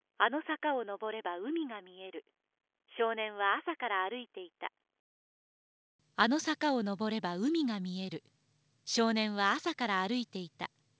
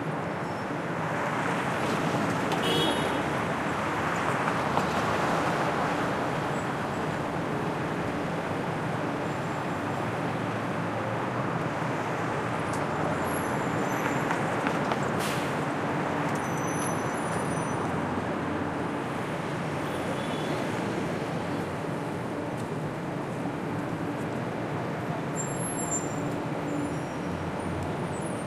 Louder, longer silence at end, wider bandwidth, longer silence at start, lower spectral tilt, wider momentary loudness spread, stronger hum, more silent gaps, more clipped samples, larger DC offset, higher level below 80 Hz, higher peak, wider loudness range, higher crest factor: second, -34 LUFS vs -30 LUFS; first, 0.3 s vs 0 s; second, 8 kHz vs 15.5 kHz; first, 0.2 s vs 0 s; about the same, -4 dB/octave vs -5 dB/octave; first, 15 LU vs 5 LU; neither; first, 4.99-5.99 s vs none; neither; neither; second, -84 dBFS vs -60 dBFS; second, -12 dBFS vs -8 dBFS; about the same, 3 LU vs 4 LU; about the same, 24 dB vs 20 dB